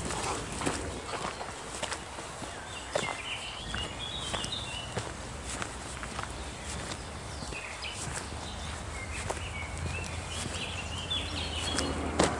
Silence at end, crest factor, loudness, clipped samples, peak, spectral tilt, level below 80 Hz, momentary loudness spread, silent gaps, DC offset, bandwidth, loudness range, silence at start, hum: 0 s; 28 dB; -35 LUFS; under 0.1%; -8 dBFS; -3 dB/octave; -46 dBFS; 7 LU; none; under 0.1%; 11.5 kHz; 4 LU; 0 s; none